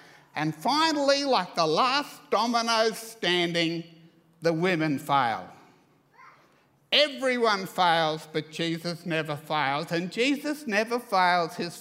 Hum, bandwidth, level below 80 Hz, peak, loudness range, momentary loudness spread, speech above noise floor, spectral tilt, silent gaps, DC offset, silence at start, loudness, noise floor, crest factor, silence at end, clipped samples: none; 16 kHz; -78 dBFS; -6 dBFS; 3 LU; 8 LU; 37 dB; -4 dB/octave; none; under 0.1%; 0.35 s; -26 LUFS; -63 dBFS; 20 dB; 0 s; under 0.1%